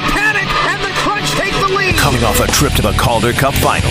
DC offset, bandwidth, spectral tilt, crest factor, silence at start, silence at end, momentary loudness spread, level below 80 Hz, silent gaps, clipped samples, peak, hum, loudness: 0.5%; 16 kHz; -4 dB/octave; 14 dB; 0 s; 0 s; 3 LU; -24 dBFS; none; under 0.1%; 0 dBFS; none; -13 LUFS